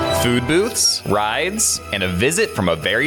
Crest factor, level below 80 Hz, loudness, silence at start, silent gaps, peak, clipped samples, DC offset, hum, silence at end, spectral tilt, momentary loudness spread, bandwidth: 12 dB; -44 dBFS; -17 LUFS; 0 s; none; -6 dBFS; under 0.1%; under 0.1%; none; 0 s; -3 dB/octave; 4 LU; 19 kHz